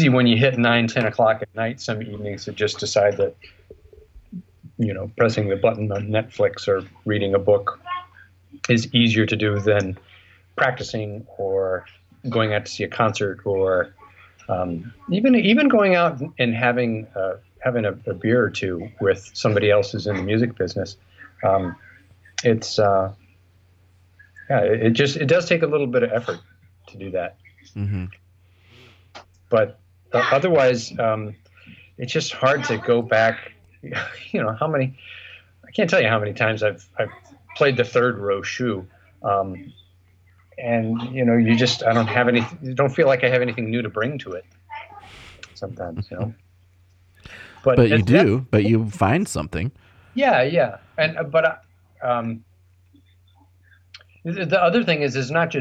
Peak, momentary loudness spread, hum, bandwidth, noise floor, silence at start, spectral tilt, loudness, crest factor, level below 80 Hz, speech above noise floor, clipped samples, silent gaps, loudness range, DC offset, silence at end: -2 dBFS; 15 LU; none; 10 kHz; -56 dBFS; 0 s; -6 dB/octave; -21 LUFS; 20 dB; -54 dBFS; 35 dB; under 0.1%; none; 6 LU; under 0.1%; 0 s